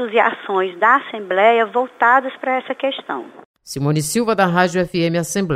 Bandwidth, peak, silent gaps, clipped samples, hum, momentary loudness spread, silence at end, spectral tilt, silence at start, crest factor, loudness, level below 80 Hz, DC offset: 16 kHz; -2 dBFS; 3.45-3.54 s; under 0.1%; none; 8 LU; 0 s; -5 dB/octave; 0 s; 16 dB; -17 LUFS; -56 dBFS; under 0.1%